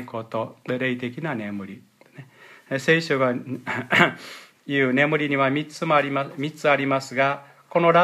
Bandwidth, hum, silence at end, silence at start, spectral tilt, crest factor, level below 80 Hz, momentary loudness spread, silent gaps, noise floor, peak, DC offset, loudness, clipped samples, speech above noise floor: 14.5 kHz; none; 0 s; 0 s; -5.5 dB/octave; 22 dB; -74 dBFS; 12 LU; none; -47 dBFS; 0 dBFS; under 0.1%; -23 LUFS; under 0.1%; 24 dB